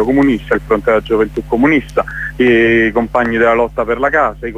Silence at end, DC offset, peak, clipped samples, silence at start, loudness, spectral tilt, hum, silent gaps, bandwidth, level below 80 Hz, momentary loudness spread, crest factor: 0 s; under 0.1%; 0 dBFS; under 0.1%; 0 s; -13 LUFS; -7 dB/octave; none; none; 13.5 kHz; -32 dBFS; 6 LU; 12 dB